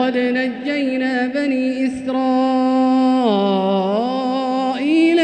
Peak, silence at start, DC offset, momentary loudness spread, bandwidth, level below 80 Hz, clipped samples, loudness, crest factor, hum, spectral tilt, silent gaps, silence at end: -4 dBFS; 0 s; under 0.1%; 5 LU; 9 kHz; -60 dBFS; under 0.1%; -18 LUFS; 12 dB; none; -6.5 dB/octave; none; 0 s